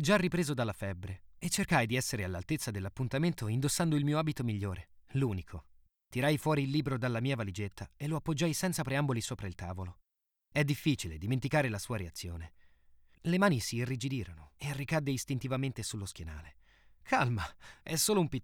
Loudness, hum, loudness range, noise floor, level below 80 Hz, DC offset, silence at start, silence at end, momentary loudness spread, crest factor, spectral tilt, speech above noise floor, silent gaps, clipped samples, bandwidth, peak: -33 LUFS; none; 3 LU; -86 dBFS; -56 dBFS; under 0.1%; 0 s; 0 s; 13 LU; 20 dB; -5 dB/octave; 53 dB; none; under 0.1%; 19 kHz; -14 dBFS